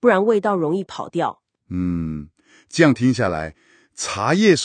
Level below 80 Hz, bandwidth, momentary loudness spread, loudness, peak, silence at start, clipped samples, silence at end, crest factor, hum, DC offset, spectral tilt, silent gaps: -48 dBFS; 9.8 kHz; 13 LU; -20 LUFS; 0 dBFS; 0 s; under 0.1%; 0 s; 20 dB; none; under 0.1%; -5.5 dB/octave; none